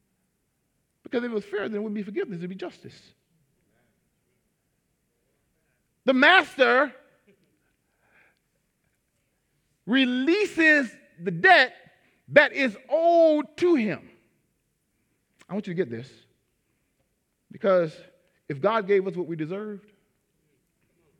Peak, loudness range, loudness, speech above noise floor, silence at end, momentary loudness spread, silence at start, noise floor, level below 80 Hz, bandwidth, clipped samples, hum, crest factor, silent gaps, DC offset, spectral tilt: -2 dBFS; 15 LU; -22 LUFS; 51 dB; 1.4 s; 18 LU; 1.15 s; -74 dBFS; -76 dBFS; 11.5 kHz; under 0.1%; none; 24 dB; none; under 0.1%; -5.5 dB/octave